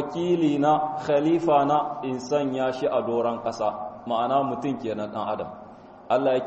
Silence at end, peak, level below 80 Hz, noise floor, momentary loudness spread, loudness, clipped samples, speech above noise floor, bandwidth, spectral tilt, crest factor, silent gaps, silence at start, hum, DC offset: 0 s; -8 dBFS; -64 dBFS; -45 dBFS; 9 LU; -25 LUFS; under 0.1%; 21 dB; 8.2 kHz; -6.5 dB/octave; 16 dB; none; 0 s; none; under 0.1%